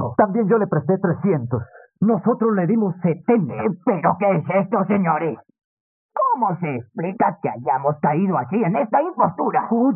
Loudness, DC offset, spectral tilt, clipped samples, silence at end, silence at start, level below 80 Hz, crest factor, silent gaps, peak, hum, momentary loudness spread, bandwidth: -20 LUFS; under 0.1%; -9.5 dB/octave; under 0.1%; 0 s; 0 s; -66 dBFS; 18 dB; 5.64-6.09 s; -2 dBFS; none; 7 LU; 3.2 kHz